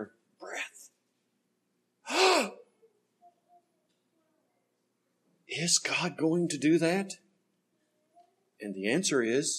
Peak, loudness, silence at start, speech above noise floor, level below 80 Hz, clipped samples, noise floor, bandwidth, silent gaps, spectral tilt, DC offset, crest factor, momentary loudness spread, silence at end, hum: -12 dBFS; -28 LUFS; 0 s; 49 dB; -84 dBFS; under 0.1%; -78 dBFS; 13 kHz; none; -3 dB/octave; under 0.1%; 22 dB; 19 LU; 0 s; none